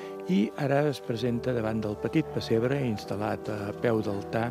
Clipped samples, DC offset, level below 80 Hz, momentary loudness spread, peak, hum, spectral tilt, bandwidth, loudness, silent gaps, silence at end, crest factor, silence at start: under 0.1%; under 0.1%; -58 dBFS; 5 LU; -12 dBFS; none; -7 dB/octave; 15.5 kHz; -29 LUFS; none; 0 s; 16 dB; 0 s